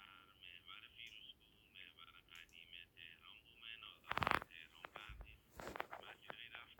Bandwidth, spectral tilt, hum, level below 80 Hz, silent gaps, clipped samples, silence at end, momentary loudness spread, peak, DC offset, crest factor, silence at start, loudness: over 20 kHz; -4 dB/octave; none; -68 dBFS; none; under 0.1%; 0 s; 18 LU; -16 dBFS; under 0.1%; 36 dB; 0 s; -50 LUFS